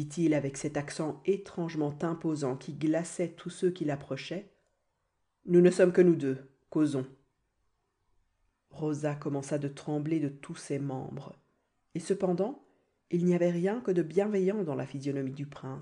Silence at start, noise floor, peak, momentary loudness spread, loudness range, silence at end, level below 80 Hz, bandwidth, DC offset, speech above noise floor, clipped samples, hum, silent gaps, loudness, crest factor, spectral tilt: 0 s; -79 dBFS; -12 dBFS; 15 LU; 7 LU; 0 s; -72 dBFS; 10.5 kHz; under 0.1%; 49 dB; under 0.1%; none; none; -31 LUFS; 20 dB; -7 dB/octave